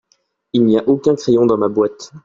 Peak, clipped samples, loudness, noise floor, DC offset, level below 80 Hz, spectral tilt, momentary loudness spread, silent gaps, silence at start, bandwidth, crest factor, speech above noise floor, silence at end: -2 dBFS; under 0.1%; -15 LUFS; -62 dBFS; under 0.1%; -54 dBFS; -7 dB/octave; 6 LU; none; 0.55 s; 7.6 kHz; 14 dB; 48 dB; 0.05 s